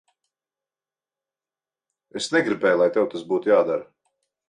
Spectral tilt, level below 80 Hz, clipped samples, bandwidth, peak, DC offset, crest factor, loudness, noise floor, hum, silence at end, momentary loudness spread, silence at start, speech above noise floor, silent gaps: -4.5 dB/octave; -72 dBFS; under 0.1%; 11 kHz; -8 dBFS; under 0.1%; 18 dB; -22 LUFS; under -90 dBFS; none; 0.65 s; 10 LU; 2.15 s; over 69 dB; none